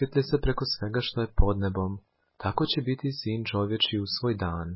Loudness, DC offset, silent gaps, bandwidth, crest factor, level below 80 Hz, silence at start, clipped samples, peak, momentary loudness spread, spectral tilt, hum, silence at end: -28 LUFS; under 0.1%; none; 5.8 kHz; 20 dB; -36 dBFS; 0 s; under 0.1%; -8 dBFS; 6 LU; -9.5 dB/octave; none; 0 s